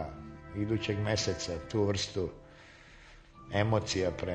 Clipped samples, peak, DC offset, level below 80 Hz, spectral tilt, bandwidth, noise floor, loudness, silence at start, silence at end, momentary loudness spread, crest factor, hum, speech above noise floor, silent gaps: under 0.1%; -12 dBFS; under 0.1%; -52 dBFS; -5 dB/octave; 9.2 kHz; -54 dBFS; -33 LUFS; 0 s; 0 s; 23 LU; 22 dB; none; 23 dB; none